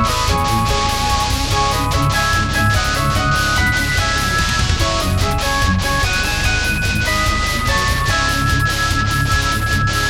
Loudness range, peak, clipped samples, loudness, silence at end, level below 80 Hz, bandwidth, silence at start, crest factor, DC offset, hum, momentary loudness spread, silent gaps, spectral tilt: 1 LU; -2 dBFS; under 0.1%; -16 LUFS; 0 s; -24 dBFS; 17.5 kHz; 0 s; 14 dB; 0.3%; none; 1 LU; none; -3.5 dB/octave